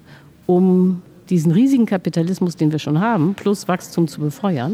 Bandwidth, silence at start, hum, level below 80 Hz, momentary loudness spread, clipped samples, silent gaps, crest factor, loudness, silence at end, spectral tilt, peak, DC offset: 15 kHz; 0.5 s; none; -62 dBFS; 7 LU; under 0.1%; none; 12 dB; -18 LUFS; 0 s; -7.5 dB/octave; -6 dBFS; under 0.1%